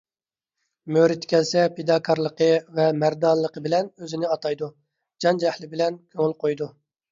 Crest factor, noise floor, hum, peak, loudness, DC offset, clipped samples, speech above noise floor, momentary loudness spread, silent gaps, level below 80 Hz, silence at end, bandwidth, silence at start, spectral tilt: 18 dB; under -90 dBFS; none; -6 dBFS; -23 LUFS; under 0.1%; under 0.1%; over 68 dB; 9 LU; none; -70 dBFS; 0.45 s; 7.6 kHz; 0.85 s; -5.5 dB/octave